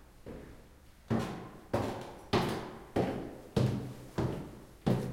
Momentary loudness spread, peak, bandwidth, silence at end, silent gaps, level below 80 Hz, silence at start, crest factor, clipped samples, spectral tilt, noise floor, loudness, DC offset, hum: 16 LU; -16 dBFS; 16.5 kHz; 0 s; none; -54 dBFS; 0 s; 20 dB; under 0.1%; -7 dB/octave; -57 dBFS; -36 LUFS; under 0.1%; none